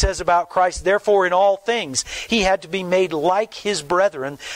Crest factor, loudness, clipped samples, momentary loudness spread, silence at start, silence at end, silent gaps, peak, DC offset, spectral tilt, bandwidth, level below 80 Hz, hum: 12 dB; -19 LUFS; under 0.1%; 6 LU; 0 s; 0 s; none; -6 dBFS; under 0.1%; -3.5 dB/octave; 15.5 kHz; -34 dBFS; none